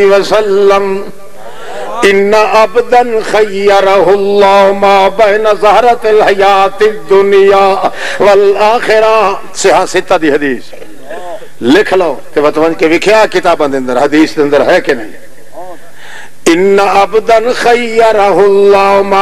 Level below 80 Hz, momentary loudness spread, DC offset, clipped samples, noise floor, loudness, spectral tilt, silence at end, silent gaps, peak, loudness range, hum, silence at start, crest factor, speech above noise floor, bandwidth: -42 dBFS; 10 LU; 9%; 0.1%; -31 dBFS; -7 LUFS; -4 dB/octave; 0 s; none; 0 dBFS; 4 LU; none; 0 s; 8 dB; 24 dB; 14 kHz